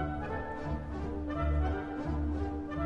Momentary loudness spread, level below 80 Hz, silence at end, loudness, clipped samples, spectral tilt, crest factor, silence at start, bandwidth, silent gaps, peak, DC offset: 6 LU; -38 dBFS; 0 s; -35 LUFS; under 0.1%; -9 dB/octave; 14 dB; 0 s; 6.2 kHz; none; -20 dBFS; under 0.1%